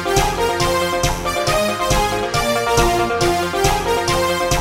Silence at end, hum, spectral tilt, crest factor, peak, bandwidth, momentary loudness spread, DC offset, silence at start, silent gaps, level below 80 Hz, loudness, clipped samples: 0 s; none; -3.5 dB/octave; 16 dB; 0 dBFS; 16.5 kHz; 3 LU; under 0.1%; 0 s; none; -28 dBFS; -17 LUFS; under 0.1%